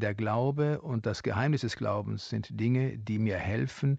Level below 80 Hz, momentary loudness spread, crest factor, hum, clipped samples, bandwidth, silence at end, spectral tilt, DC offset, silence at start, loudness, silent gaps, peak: -58 dBFS; 5 LU; 14 dB; none; under 0.1%; 8 kHz; 0 s; -7.5 dB/octave; under 0.1%; 0 s; -31 LUFS; none; -16 dBFS